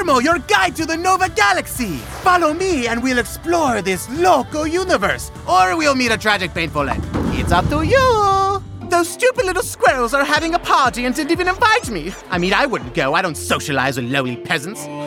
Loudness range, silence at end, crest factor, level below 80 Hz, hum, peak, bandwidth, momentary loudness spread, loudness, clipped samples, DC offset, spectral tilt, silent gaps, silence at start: 2 LU; 0 s; 16 dB; -36 dBFS; none; -2 dBFS; 18.5 kHz; 7 LU; -17 LUFS; under 0.1%; under 0.1%; -4 dB/octave; none; 0 s